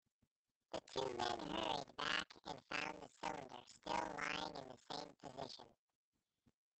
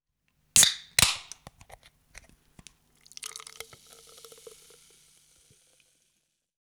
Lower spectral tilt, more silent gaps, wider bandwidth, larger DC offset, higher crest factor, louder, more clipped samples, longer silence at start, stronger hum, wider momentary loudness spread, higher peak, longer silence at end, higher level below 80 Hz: first, -3 dB/octave vs 0.5 dB/octave; neither; second, 8.8 kHz vs over 20 kHz; neither; about the same, 24 dB vs 28 dB; second, -46 LUFS vs -22 LUFS; neither; first, 0.7 s vs 0.55 s; neither; second, 12 LU vs 29 LU; second, -24 dBFS vs -6 dBFS; second, 1.05 s vs 3.25 s; second, -74 dBFS vs -56 dBFS